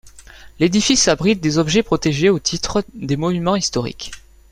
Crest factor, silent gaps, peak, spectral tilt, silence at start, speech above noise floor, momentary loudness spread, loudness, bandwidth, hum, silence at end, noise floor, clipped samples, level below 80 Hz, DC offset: 18 dB; none; 0 dBFS; -4 dB/octave; 0.05 s; 24 dB; 10 LU; -17 LUFS; 15 kHz; none; 0.3 s; -41 dBFS; under 0.1%; -42 dBFS; under 0.1%